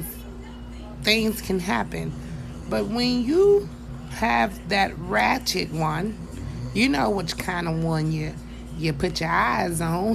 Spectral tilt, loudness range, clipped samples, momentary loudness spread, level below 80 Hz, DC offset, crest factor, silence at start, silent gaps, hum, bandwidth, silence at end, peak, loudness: -5 dB/octave; 3 LU; under 0.1%; 15 LU; -40 dBFS; under 0.1%; 20 dB; 0 s; none; none; 14.5 kHz; 0 s; -4 dBFS; -24 LUFS